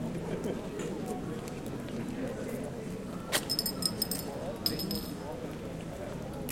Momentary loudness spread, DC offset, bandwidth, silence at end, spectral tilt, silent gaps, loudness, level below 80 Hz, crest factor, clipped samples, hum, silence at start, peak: 9 LU; under 0.1%; 17 kHz; 0 s; -4 dB/octave; none; -35 LUFS; -52 dBFS; 24 dB; under 0.1%; none; 0 s; -12 dBFS